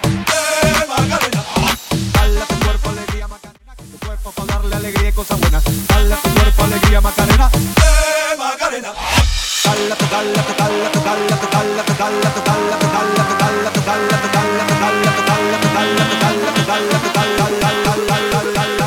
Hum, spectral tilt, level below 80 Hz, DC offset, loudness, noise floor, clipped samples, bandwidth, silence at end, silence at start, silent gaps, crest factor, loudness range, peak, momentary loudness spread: none; -4 dB/octave; -20 dBFS; under 0.1%; -15 LUFS; -37 dBFS; under 0.1%; 17.5 kHz; 0 s; 0 s; none; 14 dB; 5 LU; 0 dBFS; 6 LU